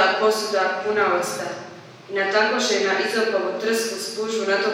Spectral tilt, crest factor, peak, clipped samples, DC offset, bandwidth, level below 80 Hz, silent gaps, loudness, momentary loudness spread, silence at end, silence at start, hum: -2 dB/octave; 16 dB; -6 dBFS; under 0.1%; under 0.1%; 17 kHz; -78 dBFS; none; -22 LUFS; 10 LU; 0 s; 0 s; none